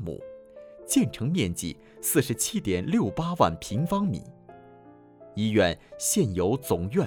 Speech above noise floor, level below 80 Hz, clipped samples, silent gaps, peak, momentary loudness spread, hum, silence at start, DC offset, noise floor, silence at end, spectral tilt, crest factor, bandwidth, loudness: 26 dB; -52 dBFS; under 0.1%; none; -6 dBFS; 13 LU; none; 0 s; under 0.1%; -51 dBFS; 0 s; -5 dB/octave; 22 dB; over 20 kHz; -26 LUFS